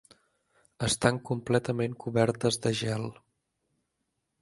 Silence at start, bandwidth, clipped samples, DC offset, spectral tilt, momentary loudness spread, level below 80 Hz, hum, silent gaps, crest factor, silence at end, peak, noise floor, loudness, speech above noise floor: 0.8 s; 11.5 kHz; under 0.1%; under 0.1%; -5 dB/octave; 7 LU; -58 dBFS; none; none; 24 dB; 1.3 s; -6 dBFS; -81 dBFS; -29 LUFS; 52 dB